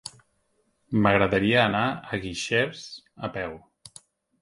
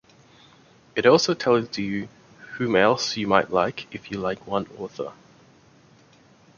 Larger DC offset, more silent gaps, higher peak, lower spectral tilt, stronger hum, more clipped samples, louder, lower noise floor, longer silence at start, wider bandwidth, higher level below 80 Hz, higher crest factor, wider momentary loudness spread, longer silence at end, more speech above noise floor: neither; neither; about the same, -4 dBFS vs -2 dBFS; about the same, -5 dB/octave vs -4.5 dB/octave; neither; neither; about the same, -24 LUFS vs -23 LUFS; first, -70 dBFS vs -55 dBFS; second, 0.05 s vs 0.95 s; first, 11.5 kHz vs 7.2 kHz; first, -52 dBFS vs -60 dBFS; about the same, 22 dB vs 24 dB; about the same, 19 LU vs 17 LU; second, 0.85 s vs 1.45 s; first, 46 dB vs 32 dB